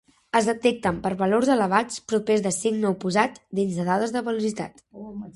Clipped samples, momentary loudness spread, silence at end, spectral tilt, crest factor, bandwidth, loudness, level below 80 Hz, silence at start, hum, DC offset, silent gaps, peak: under 0.1%; 9 LU; 0.05 s; -5 dB/octave; 20 dB; 11.5 kHz; -24 LUFS; -58 dBFS; 0.35 s; none; under 0.1%; none; -4 dBFS